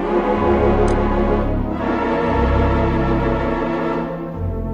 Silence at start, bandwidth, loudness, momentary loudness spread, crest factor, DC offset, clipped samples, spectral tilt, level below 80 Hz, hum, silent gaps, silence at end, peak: 0 s; 9.4 kHz; -19 LUFS; 7 LU; 14 dB; under 0.1%; under 0.1%; -8.5 dB/octave; -24 dBFS; none; none; 0 s; -2 dBFS